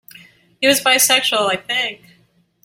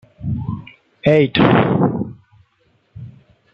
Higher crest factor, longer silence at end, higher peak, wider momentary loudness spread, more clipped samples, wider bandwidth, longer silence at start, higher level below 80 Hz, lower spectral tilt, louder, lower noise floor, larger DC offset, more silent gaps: about the same, 18 dB vs 18 dB; first, 0.7 s vs 0.45 s; about the same, 0 dBFS vs 0 dBFS; second, 8 LU vs 24 LU; neither; first, 16.5 kHz vs 6.2 kHz; first, 0.6 s vs 0.2 s; second, -64 dBFS vs -46 dBFS; second, -0.5 dB/octave vs -9 dB/octave; about the same, -15 LUFS vs -16 LUFS; about the same, -58 dBFS vs -61 dBFS; neither; neither